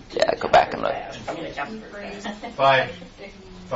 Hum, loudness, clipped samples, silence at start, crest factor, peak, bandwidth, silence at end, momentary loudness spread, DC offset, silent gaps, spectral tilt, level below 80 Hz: none; -23 LUFS; under 0.1%; 0 s; 20 dB; -4 dBFS; 8 kHz; 0 s; 22 LU; under 0.1%; none; -4.5 dB/octave; -50 dBFS